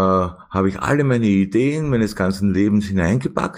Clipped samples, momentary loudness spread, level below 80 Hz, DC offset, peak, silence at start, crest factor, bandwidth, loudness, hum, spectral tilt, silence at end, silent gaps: under 0.1%; 4 LU; -42 dBFS; under 0.1%; -4 dBFS; 0 s; 14 dB; 15 kHz; -19 LUFS; none; -7.5 dB/octave; 0 s; none